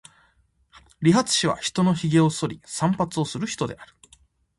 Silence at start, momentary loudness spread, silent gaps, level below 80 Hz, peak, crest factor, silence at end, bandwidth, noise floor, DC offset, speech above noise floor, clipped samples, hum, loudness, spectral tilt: 0.75 s; 10 LU; none; -56 dBFS; -6 dBFS; 18 dB; 0.75 s; 11.5 kHz; -63 dBFS; under 0.1%; 41 dB; under 0.1%; none; -23 LUFS; -5 dB/octave